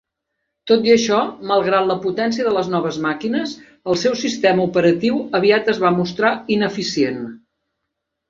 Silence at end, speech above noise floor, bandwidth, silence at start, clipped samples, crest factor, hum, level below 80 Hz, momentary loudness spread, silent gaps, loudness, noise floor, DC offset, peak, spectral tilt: 0.9 s; 60 dB; 7.6 kHz; 0.65 s; under 0.1%; 16 dB; none; -58 dBFS; 7 LU; none; -18 LUFS; -78 dBFS; under 0.1%; -2 dBFS; -5 dB/octave